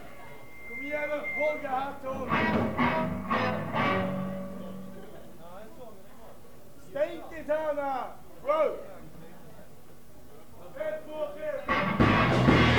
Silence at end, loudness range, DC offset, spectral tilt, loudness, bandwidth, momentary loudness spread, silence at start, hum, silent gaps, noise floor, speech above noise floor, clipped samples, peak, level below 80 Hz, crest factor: 0 s; 8 LU; 0.7%; -6.5 dB/octave; -29 LUFS; 19.5 kHz; 24 LU; 0 s; none; none; -53 dBFS; 25 dB; under 0.1%; -8 dBFS; -48 dBFS; 22 dB